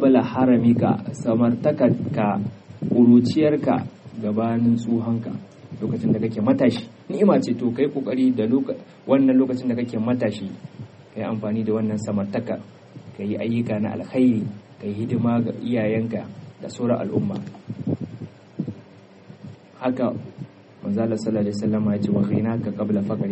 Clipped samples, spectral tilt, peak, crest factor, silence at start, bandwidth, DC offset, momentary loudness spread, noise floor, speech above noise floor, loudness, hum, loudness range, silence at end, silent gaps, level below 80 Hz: under 0.1%; -8.5 dB/octave; -4 dBFS; 18 dB; 0 s; 8.4 kHz; under 0.1%; 16 LU; -47 dBFS; 26 dB; -22 LUFS; none; 9 LU; 0 s; none; -62 dBFS